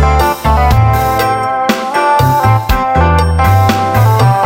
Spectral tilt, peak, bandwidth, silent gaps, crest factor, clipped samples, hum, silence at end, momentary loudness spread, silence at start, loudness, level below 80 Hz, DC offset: -6 dB/octave; 0 dBFS; 17 kHz; none; 10 dB; under 0.1%; none; 0 s; 4 LU; 0 s; -10 LUFS; -18 dBFS; under 0.1%